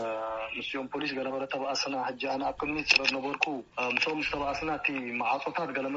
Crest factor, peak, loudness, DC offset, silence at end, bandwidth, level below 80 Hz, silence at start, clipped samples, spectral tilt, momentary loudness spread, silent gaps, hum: 24 dB; -8 dBFS; -30 LUFS; under 0.1%; 0 s; 7.6 kHz; -60 dBFS; 0 s; under 0.1%; -1 dB/octave; 10 LU; none; none